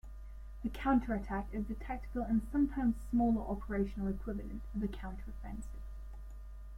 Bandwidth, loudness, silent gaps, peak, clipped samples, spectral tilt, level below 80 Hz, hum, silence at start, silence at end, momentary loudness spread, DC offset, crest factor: 14 kHz; -37 LUFS; none; -20 dBFS; under 0.1%; -8 dB/octave; -44 dBFS; none; 0.05 s; 0 s; 18 LU; under 0.1%; 18 dB